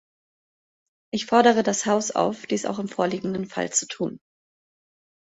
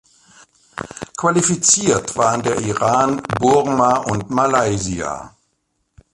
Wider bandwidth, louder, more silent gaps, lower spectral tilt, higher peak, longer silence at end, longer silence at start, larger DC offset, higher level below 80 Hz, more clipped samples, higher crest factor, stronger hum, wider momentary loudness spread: second, 8.2 kHz vs 11.5 kHz; second, -24 LUFS vs -17 LUFS; neither; about the same, -3.5 dB/octave vs -4 dB/octave; second, -4 dBFS vs 0 dBFS; first, 1.05 s vs 0.85 s; first, 1.15 s vs 0.75 s; neither; second, -66 dBFS vs -46 dBFS; neither; about the same, 22 dB vs 18 dB; neither; second, 13 LU vs 16 LU